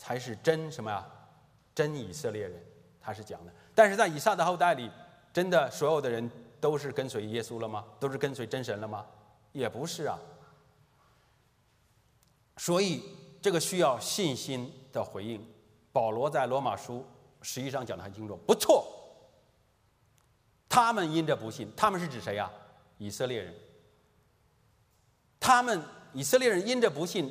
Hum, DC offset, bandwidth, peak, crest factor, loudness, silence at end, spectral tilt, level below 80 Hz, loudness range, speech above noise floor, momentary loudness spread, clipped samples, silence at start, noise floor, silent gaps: none; under 0.1%; 15.5 kHz; -8 dBFS; 24 dB; -30 LUFS; 0 s; -4 dB/octave; -72 dBFS; 9 LU; 38 dB; 18 LU; under 0.1%; 0 s; -68 dBFS; none